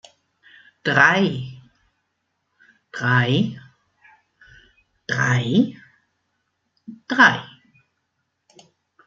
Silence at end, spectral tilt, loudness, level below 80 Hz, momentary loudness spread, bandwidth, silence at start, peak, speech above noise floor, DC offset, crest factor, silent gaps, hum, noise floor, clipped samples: 1.6 s; -5.5 dB/octave; -19 LUFS; -64 dBFS; 22 LU; 7.4 kHz; 0.85 s; 0 dBFS; 57 dB; under 0.1%; 24 dB; none; none; -75 dBFS; under 0.1%